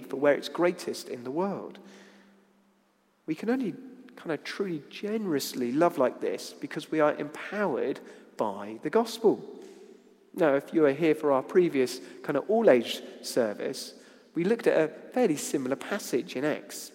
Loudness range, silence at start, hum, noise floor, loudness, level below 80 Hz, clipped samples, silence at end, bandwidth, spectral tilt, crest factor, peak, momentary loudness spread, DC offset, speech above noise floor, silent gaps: 9 LU; 0 s; none; -68 dBFS; -29 LUFS; -84 dBFS; under 0.1%; 0.05 s; 16.5 kHz; -5 dB/octave; 22 dB; -6 dBFS; 13 LU; under 0.1%; 40 dB; none